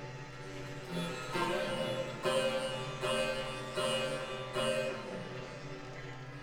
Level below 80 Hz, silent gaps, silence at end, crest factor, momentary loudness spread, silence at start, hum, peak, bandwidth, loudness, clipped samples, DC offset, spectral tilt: -58 dBFS; none; 0 s; 18 dB; 12 LU; 0 s; none; -20 dBFS; 19.5 kHz; -37 LUFS; under 0.1%; under 0.1%; -4 dB/octave